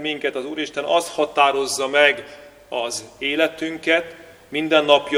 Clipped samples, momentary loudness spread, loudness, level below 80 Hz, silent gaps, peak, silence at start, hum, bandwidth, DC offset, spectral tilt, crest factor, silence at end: under 0.1%; 12 LU; -20 LUFS; -62 dBFS; none; 0 dBFS; 0 s; none; 16 kHz; under 0.1%; -2 dB/octave; 20 dB; 0 s